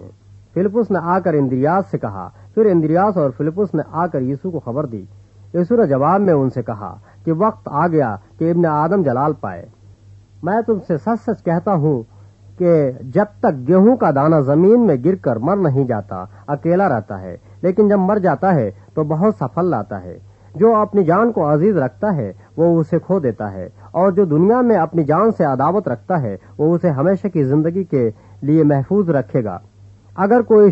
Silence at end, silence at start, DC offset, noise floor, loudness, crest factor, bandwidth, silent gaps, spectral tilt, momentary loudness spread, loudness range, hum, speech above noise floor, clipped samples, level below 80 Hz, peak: 0 s; 0 s; under 0.1%; -44 dBFS; -17 LUFS; 14 dB; 7.2 kHz; none; -11 dB/octave; 13 LU; 4 LU; none; 28 dB; under 0.1%; -54 dBFS; -2 dBFS